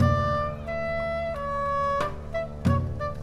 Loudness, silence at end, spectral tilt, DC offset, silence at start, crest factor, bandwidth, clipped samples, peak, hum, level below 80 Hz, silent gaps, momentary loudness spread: -28 LUFS; 0 s; -7.5 dB/octave; under 0.1%; 0 s; 18 dB; 11.5 kHz; under 0.1%; -10 dBFS; none; -40 dBFS; none; 6 LU